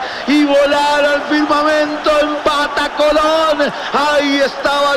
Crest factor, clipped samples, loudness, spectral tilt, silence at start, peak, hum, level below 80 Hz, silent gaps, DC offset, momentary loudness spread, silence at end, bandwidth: 10 dB; under 0.1%; -13 LUFS; -3 dB/octave; 0 s; -4 dBFS; none; -44 dBFS; none; under 0.1%; 3 LU; 0 s; 15 kHz